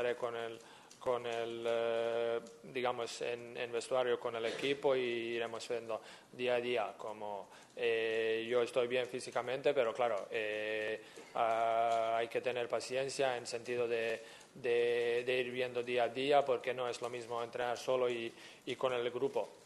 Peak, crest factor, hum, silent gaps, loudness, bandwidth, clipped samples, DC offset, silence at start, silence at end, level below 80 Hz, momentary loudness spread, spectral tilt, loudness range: -16 dBFS; 20 dB; none; none; -37 LUFS; 12 kHz; under 0.1%; under 0.1%; 0 s; 0 s; -82 dBFS; 11 LU; -4 dB/octave; 3 LU